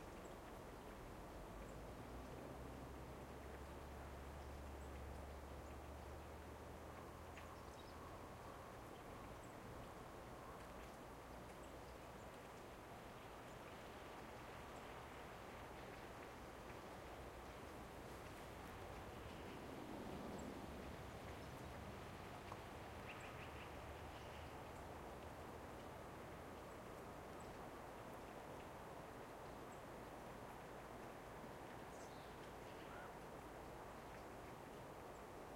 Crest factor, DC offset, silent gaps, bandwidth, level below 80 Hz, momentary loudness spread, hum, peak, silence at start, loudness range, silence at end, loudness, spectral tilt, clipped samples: 16 dB; under 0.1%; none; 16 kHz; -64 dBFS; 3 LU; none; -38 dBFS; 0 s; 3 LU; 0 s; -55 LUFS; -5 dB/octave; under 0.1%